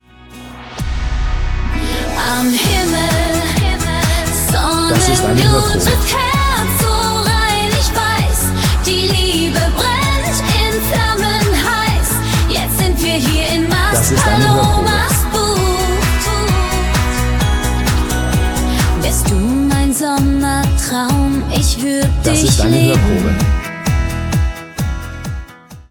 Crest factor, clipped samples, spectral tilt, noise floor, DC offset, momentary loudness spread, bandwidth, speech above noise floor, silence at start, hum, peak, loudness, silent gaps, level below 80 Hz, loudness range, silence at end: 14 dB; under 0.1%; -4.5 dB/octave; -35 dBFS; under 0.1%; 7 LU; 19 kHz; 23 dB; 0.3 s; none; 0 dBFS; -14 LUFS; none; -20 dBFS; 2 LU; 0.1 s